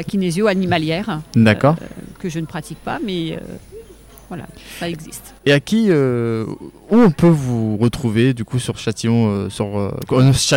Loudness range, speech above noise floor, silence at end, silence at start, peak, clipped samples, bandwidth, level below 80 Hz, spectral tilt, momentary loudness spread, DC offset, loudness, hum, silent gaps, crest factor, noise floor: 10 LU; 24 dB; 0 s; 0 s; 0 dBFS; under 0.1%; 17 kHz; -44 dBFS; -6 dB/octave; 18 LU; under 0.1%; -18 LUFS; none; none; 16 dB; -41 dBFS